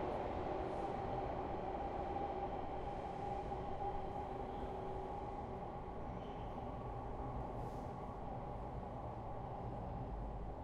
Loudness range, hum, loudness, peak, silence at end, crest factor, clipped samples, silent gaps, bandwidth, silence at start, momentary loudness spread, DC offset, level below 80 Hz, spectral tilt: 4 LU; none; -45 LUFS; -30 dBFS; 0 s; 14 dB; under 0.1%; none; 10.5 kHz; 0 s; 5 LU; under 0.1%; -52 dBFS; -8 dB/octave